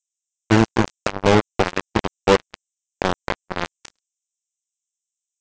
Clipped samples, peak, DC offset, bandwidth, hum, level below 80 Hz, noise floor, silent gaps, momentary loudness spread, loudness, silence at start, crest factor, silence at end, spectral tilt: under 0.1%; -6 dBFS; under 0.1%; 8 kHz; none; -44 dBFS; -84 dBFS; none; 10 LU; -21 LUFS; 0.5 s; 18 dB; 1.75 s; -5.5 dB/octave